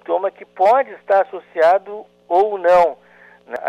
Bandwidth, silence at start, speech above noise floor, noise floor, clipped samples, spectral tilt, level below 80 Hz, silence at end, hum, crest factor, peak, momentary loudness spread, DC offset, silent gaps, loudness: 9.2 kHz; 0.1 s; 31 dB; -46 dBFS; under 0.1%; -5 dB/octave; -60 dBFS; 0 s; 60 Hz at -60 dBFS; 12 dB; -6 dBFS; 12 LU; under 0.1%; none; -17 LUFS